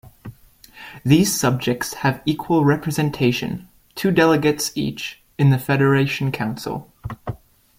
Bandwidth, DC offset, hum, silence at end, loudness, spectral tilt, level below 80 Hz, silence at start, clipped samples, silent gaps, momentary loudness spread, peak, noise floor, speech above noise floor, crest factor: 16.5 kHz; under 0.1%; none; 0.45 s; -20 LUFS; -5.5 dB/octave; -50 dBFS; 0.05 s; under 0.1%; none; 17 LU; -2 dBFS; -47 dBFS; 28 dB; 18 dB